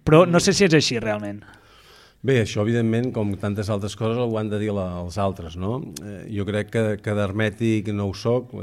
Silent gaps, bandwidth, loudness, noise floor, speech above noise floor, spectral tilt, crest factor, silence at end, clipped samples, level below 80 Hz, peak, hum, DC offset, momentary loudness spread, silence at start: none; 14 kHz; -22 LUFS; -51 dBFS; 29 dB; -5.5 dB/octave; 20 dB; 0 s; under 0.1%; -50 dBFS; -2 dBFS; none; under 0.1%; 13 LU; 0.05 s